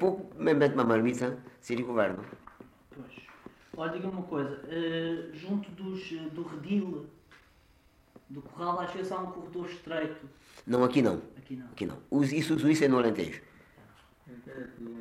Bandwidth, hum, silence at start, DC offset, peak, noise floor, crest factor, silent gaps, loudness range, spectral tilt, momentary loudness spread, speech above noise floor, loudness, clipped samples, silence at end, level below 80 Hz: 15 kHz; none; 0 s; under 0.1%; -12 dBFS; -63 dBFS; 20 dB; none; 9 LU; -6.5 dB/octave; 22 LU; 32 dB; -31 LUFS; under 0.1%; 0 s; -66 dBFS